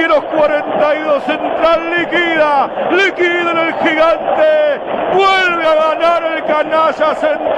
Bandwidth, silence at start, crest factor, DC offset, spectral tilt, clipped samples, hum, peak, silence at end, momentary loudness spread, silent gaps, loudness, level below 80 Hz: 9.2 kHz; 0 s; 10 dB; under 0.1%; -4.5 dB/octave; under 0.1%; none; -2 dBFS; 0 s; 4 LU; none; -12 LUFS; -48 dBFS